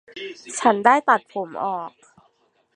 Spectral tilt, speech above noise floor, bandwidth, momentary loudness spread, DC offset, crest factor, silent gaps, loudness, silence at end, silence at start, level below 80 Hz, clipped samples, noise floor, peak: -3.5 dB/octave; 43 dB; 11.5 kHz; 19 LU; under 0.1%; 22 dB; none; -20 LUFS; 0.9 s; 0.15 s; -72 dBFS; under 0.1%; -64 dBFS; -2 dBFS